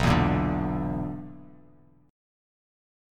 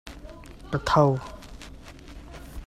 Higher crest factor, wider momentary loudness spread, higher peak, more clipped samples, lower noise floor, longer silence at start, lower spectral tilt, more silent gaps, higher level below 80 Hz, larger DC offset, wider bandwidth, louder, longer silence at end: about the same, 22 dB vs 24 dB; second, 21 LU vs 25 LU; second, -8 dBFS vs -4 dBFS; neither; first, -57 dBFS vs -44 dBFS; about the same, 0 s vs 0.05 s; about the same, -7 dB/octave vs -6.5 dB/octave; neither; about the same, -40 dBFS vs -44 dBFS; neither; about the same, 14 kHz vs 14 kHz; second, -27 LUFS vs -24 LUFS; first, 1.6 s vs 0 s